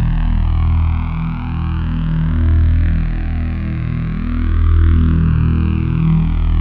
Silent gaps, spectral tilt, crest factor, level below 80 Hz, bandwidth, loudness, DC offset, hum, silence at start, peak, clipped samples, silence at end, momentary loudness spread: none; -11 dB/octave; 10 dB; -16 dBFS; 4.3 kHz; -17 LUFS; under 0.1%; none; 0 s; -4 dBFS; under 0.1%; 0 s; 7 LU